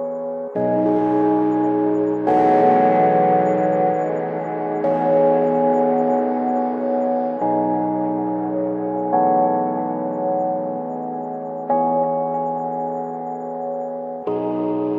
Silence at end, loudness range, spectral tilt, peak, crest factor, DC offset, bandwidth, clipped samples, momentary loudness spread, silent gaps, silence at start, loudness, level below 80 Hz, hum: 0 s; 6 LU; -9.5 dB/octave; -4 dBFS; 16 dB; under 0.1%; 7.2 kHz; under 0.1%; 11 LU; none; 0 s; -20 LUFS; -68 dBFS; none